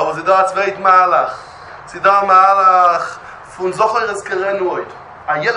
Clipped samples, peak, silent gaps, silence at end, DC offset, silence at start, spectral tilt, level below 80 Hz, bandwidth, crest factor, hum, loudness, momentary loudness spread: under 0.1%; 0 dBFS; none; 0 s; under 0.1%; 0 s; -4 dB/octave; -56 dBFS; 11 kHz; 14 dB; none; -13 LUFS; 22 LU